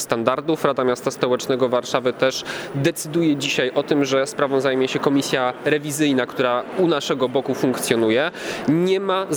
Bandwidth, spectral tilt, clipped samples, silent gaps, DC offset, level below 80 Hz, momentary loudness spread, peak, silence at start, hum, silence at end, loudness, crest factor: over 20 kHz; -4.5 dB/octave; under 0.1%; none; under 0.1%; -62 dBFS; 3 LU; -2 dBFS; 0 s; none; 0 s; -20 LUFS; 20 dB